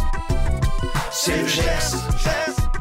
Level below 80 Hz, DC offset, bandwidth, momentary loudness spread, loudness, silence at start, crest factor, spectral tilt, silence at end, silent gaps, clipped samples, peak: -22 dBFS; under 0.1%; 16.5 kHz; 5 LU; -22 LUFS; 0 s; 12 dB; -4 dB/octave; 0 s; none; under 0.1%; -8 dBFS